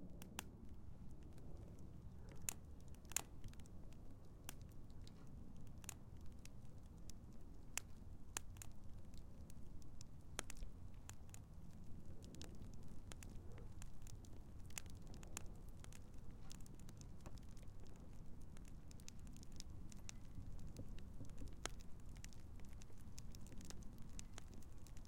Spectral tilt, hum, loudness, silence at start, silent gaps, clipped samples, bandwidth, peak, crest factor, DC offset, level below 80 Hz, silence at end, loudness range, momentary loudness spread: -3.5 dB/octave; none; -57 LUFS; 0 s; none; under 0.1%; 16.5 kHz; -20 dBFS; 30 dB; under 0.1%; -58 dBFS; 0 s; 6 LU; 9 LU